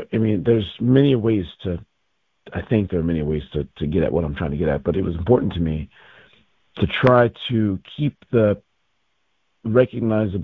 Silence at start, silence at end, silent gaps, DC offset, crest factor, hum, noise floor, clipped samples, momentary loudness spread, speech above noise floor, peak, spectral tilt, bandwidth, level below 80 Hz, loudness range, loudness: 0 s; 0 s; none; under 0.1%; 20 dB; none; -72 dBFS; under 0.1%; 13 LU; 53 dB; -2 dBFS; -10 dB/octave; 5.4 kHz; -38 dBFS; 3 LU; -21 LUFS